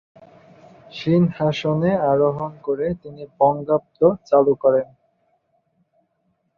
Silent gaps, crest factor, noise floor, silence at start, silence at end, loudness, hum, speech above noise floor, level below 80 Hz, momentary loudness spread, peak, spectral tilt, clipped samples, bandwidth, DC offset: none; 18 dB; -69 dBFS; 0.95 s; 1.75 s; -20 LUFS; none; 50 dB; -56 dBFS; 11 LU; -2 dBFS; -8.5 dB/octave; under 0.1%; 7 kHz; under 0.1%